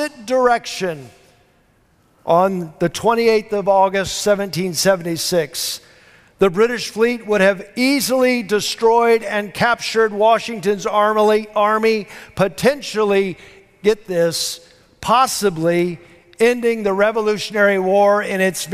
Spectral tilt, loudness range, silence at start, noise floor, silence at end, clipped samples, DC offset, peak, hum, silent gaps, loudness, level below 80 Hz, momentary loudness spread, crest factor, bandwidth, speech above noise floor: -4 dB/octave; 3 LU; 0 s; -57 dBFS; 0 s; under 0.1%; under 0.1%; -4 dBFS; none; none; -17 LUFS; -52 dBFS; 8 LU; 14 dB; 16 kHz; 40 dB